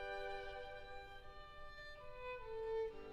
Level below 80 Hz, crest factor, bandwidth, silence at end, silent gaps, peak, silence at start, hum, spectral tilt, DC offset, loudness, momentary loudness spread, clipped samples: -60 dBFS; 14 dB; 12.5 kHz; 0 s; none; -34 dBFS; 0 s; none; -4.5 dB/octave; under 0.1%; -49 LUFS; 12 LU; under 0.1%